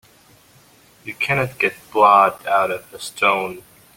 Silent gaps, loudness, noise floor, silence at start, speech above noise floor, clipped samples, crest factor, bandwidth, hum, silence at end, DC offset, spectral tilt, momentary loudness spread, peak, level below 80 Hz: none; -18 LUFS; -51 dBFS; 1.05 s; 33 dB; under 0.1%; 18 dB; 17 kHz; none; 0.35 s; under 0.1%; -4 dB/octave; 20 LU; -2 dBFS; -58 dBFS